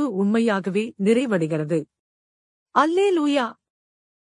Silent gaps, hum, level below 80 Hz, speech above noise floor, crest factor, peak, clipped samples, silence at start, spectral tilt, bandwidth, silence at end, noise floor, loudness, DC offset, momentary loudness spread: 1.99-2.66 s; none; -74 dBFS; over 69 dB; 18 dB; -4 dBFS; under 0.1%; 0 s; -6.5 dB/octave; 11 kHz; 0.8 s; under -90 dBFS; -22 LUFS; under 0.1%; 7 LU